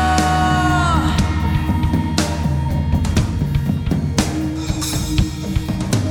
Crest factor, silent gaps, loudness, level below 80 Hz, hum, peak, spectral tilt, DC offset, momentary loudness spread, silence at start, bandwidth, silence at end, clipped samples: 16 dB; none; -18 LUFS; -24 dBFS; none; -2 dBFS; -5.5 dB/octave; under 0.1%; 6 LU; 0 s; 18 kHz; 0 s; under 0.1%